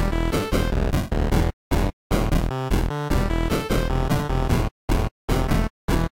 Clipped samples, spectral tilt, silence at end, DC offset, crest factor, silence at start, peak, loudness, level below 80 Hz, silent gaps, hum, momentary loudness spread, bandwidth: under 0.1%; -6 dB/octave; 0.1 s; under 0.1%; 12 dB; 0 s; -10 dBFS; -24 LUFS; -26 dBFS; 1.53-1.71 s, 1.93-2.10 s, 4.71-4.88 s, 5.11-5.28 s, 5.70-5.88 s; none; 2 LU; 16.5 kHz